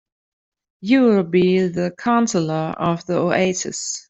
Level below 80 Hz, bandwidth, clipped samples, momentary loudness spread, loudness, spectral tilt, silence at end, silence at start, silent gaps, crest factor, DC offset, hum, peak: -58 dBFS; 8.2 kHz; under 0.1%; 8 LU; -19 LUFS; -5 dB/octave; 0.1 s; 0.8 s; none; 16 dB; under 0.1%; none; -4 dBFS